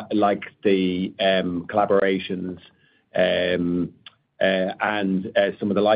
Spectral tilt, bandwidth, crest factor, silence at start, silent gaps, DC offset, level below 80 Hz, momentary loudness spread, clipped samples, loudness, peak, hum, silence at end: -10 dB/octave; 5.2 kHz; 16 dB; 0 s; none; under 0.1%; -62 dBFS; 9 LU; under 0.1%; -22 LUFS; -6 dBFS; none; 0 s